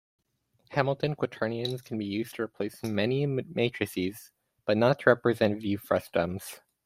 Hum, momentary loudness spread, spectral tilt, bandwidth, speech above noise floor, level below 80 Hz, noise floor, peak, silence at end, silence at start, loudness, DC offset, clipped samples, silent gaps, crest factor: none; 11 LU; -6.5 dB/octave; 16 kHz; 42 dB; -66 dBFS; -71 dBFS; -6 dBFS; 0.3 s; 0.7 s; -29 LUFS; under 0.1%; under 0.1%; none; 22 dB